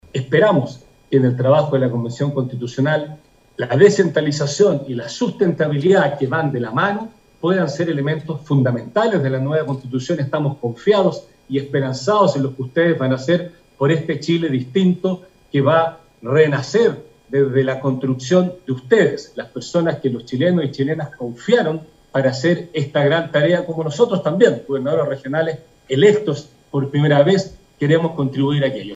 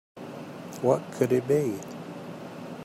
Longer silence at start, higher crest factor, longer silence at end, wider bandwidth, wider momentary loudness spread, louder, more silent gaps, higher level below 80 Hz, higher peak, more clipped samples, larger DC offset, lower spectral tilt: about the same, 0.15 s vs 0.15 s; about the same, 18 dB vs 20 dB; about the same, 0 s vs 0 s; second, 8.2 kHz vs 16 kHz; second, 10 LU vs 16 LU; first, -18 LUFS vs -27 LUFS; neither; first, -58 dBFS vs -72 dBFS; first, 0 dBFS vs -8 dBFS; neither; neither; about the same, -6.5 dB/octave vs -7 dB/octave